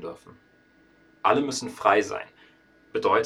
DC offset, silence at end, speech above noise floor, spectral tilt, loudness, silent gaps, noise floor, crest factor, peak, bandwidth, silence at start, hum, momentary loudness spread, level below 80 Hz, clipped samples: under 0.1%; 0 s; 35 dB; -3.5 dB/octave; -25 LUFS; none; -59 dBFS; 22 dB; -4 dBFS; 13 kHz; 0 s; none; 19 LU; -66 dBFS; under 0.1%